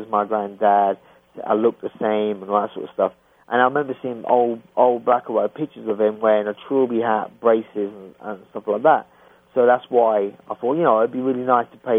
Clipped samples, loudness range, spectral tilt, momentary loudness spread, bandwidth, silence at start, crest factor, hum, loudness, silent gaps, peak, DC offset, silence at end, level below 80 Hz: under 0.1%; 2 LU; -8.5 dB/octave; 11 LU; 3.7 kHz; 0 s; 18 dB; none; -20 LUFS; none; -2 dBFS; under 0.1%; 0 s; -70 dBFS